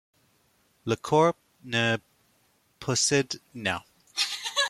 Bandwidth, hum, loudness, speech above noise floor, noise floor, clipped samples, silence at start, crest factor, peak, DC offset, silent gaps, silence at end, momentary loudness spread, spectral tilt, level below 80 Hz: 15.5 kHz; none; -27 LUFS; 41 dB; -67 dBFS; under 0.1%; 0.85 s; 20 dB; -10 dBFS; under 0.1%; none; 0 s; 12 LU; -3 dB/octave; -66 dBFS